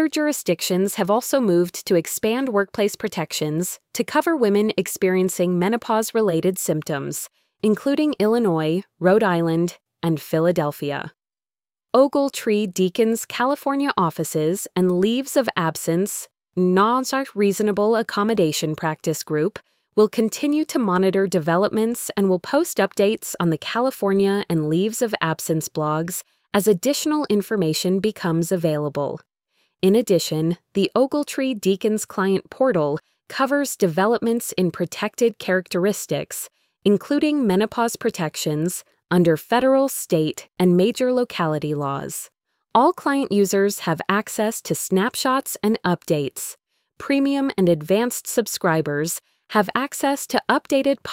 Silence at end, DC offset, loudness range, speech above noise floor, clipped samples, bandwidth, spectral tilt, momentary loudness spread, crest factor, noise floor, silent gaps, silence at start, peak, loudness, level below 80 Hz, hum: 0 s; under 0.1%; 2 LU; over 70 dB; under 0.1%; 16.5 kHz; -5 dB/octave; 7 LU; 18 dB; under -90 dBFS; none; 0 s; -2 dBFS; -21 LUFS; -62 dBFS; none